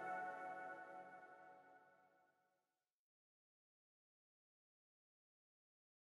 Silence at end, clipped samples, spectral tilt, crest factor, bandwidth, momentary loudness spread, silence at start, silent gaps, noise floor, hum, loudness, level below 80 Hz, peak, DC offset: 3.95 s; under 0.1%; -5 dB/octave; 20 dB; 11.5 kHz; 17 LU; 0 s; none; under -90 dBFS; none; -53 LUFS; under -90 dBFS; -38 dBFS; under 0.1%